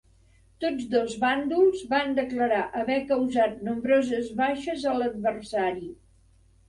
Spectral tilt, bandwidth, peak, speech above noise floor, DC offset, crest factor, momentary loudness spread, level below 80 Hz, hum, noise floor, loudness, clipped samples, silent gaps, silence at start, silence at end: -5 dB/octave; 11.5 kHz; -12 dBFS; 33 dB; under 0.1%; 16 dB; 7 LU; -58 dBFS; none; -59 dBFS; -26 LUFS; under 0.1%; none; 0.6 s; 0.75 s